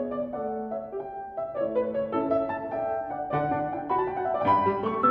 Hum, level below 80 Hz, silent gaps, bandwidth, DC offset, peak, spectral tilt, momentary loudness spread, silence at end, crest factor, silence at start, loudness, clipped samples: none; -58 dBFS; none; 5.4 kHz; under 0.1%; -12 dBFS; -9.5 dB/octave; 10 LU; 0 s; 16 dB; 0 s; -28 LUFS; under 0.1%